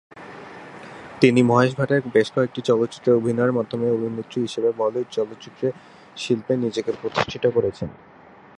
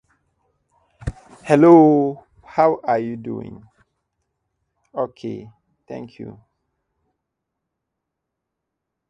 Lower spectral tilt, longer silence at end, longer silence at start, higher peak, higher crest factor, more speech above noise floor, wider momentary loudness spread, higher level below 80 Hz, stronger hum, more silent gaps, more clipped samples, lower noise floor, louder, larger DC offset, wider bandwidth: second, -6.5 dB/octave vs -8.5 dB/octave; second, 0.65 s vs 2.8 s; second, 0.15 s vs 1.05 s; about the same, 0 dBFS vs 0 dBFS; about the same, 22 dB vs 22 dB; second, 18 dB vs 64 dB; second, 21 LU vs 27 LU; second, -58 dBFS vs -48 dBFS; neither; neither; neither; second, -40 dBFS vs -81 dBFS; second, -22 LUFS vs -17 LUFS; neither; about the same, 11 kHz vs 10.5 kHz